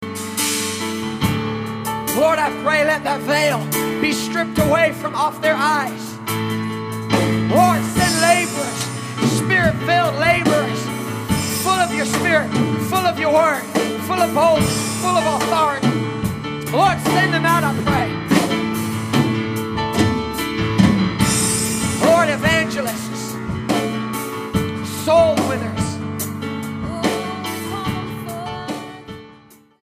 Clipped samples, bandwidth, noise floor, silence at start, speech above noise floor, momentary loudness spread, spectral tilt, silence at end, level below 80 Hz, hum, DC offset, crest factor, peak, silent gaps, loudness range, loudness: under 0.1%; 15.5 kHz; -47 dBFS; 0 s; 30 dB; 10 LU; -4.5 dB/octave; 0.5 s; -44 dBFS; none; under 0.1%; 18 dB; 0 dBFS; none; 3 LU; -18 LUFS